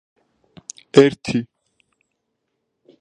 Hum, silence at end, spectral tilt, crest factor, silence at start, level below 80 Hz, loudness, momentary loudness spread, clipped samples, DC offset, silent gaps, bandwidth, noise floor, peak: none; 1.55 s; -5.5 dB/octave; 22 dB; 0.95 s; -58 dBFS; -17 LUFS; 24 LU; under 0.1%; under 0.1%; none; 9.6 kHz; -75 dBFS; 0 dBFS